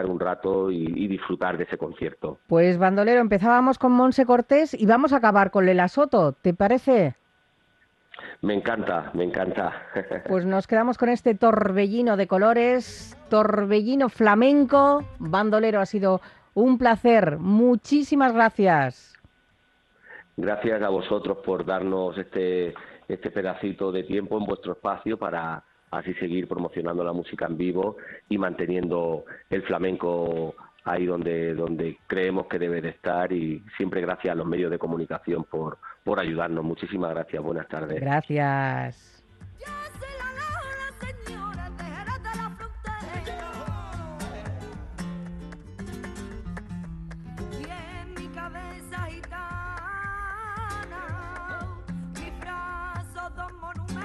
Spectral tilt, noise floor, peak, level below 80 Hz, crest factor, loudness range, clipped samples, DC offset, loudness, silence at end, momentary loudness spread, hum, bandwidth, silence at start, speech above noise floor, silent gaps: -7.5 dB/octave; -64 dBFS; -6 dBFS; -48 dBFS; 18 dB; 16 LU; under 0.1%; under 0.1%; -24 LUFS; 0 s; 18 LU; none; 12 kHz; 0 s; 41 dB; none